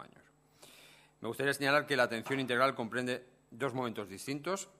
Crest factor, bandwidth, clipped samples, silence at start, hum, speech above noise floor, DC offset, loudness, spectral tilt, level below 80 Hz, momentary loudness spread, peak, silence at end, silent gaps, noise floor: 22 dB; 15.5 kHz; under 0.1%; 0 s; none; 30 dB; under 0.1%; -34 LUFS; -4 dB/octave; -76 dBFS; 12 LU; -14 dBFS; 0.15 s; none; -64 dBFS